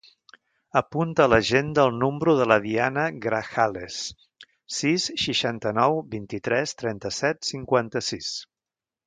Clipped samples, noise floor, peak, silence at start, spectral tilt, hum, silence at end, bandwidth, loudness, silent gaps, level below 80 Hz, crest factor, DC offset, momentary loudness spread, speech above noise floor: under 0.1%; under -90 dBFS; -4 dBFS; 0.75 s; -4.5 dB/octave; none; 0.6 s; 9.6 kHz; -24 LUFS; none; -54 dBFS; 22 dB; under 0.1%; 12 LU; over 66 dB